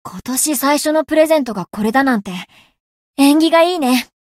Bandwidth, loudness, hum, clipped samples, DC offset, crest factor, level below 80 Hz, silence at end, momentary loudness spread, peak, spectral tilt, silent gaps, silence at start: 16.5 kHz; -14 LUFS; none; under 0.1%; under 0.1%; 14 dB; -56 dBFS; 0.15 s; 11 LU; -2 dBFS; -3.5 dB/octave; 2.80-3.14 s; 0.05 s